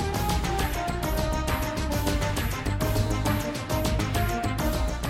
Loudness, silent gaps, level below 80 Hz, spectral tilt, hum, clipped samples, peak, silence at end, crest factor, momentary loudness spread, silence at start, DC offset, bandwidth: -27 LUFS; none; -32 dBFS; -5 dB/octave; none; under 0.1%; -12 dBFS; 0 s; 14 dB; 2 LU; 0 s; under 0.1%; 16.5 kHz